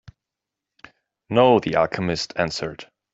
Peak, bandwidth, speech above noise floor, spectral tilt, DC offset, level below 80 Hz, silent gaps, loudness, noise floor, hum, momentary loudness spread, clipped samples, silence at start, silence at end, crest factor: -2 dBFS; 8 kHz; 65 dB; -5.5 dB/octave; under 0.1%; -54 dBFS; none; -21 LUFS; -86 dBFS; none; 14 LU; under 0.1%; 1.3 s; 0.3 s; 20 dB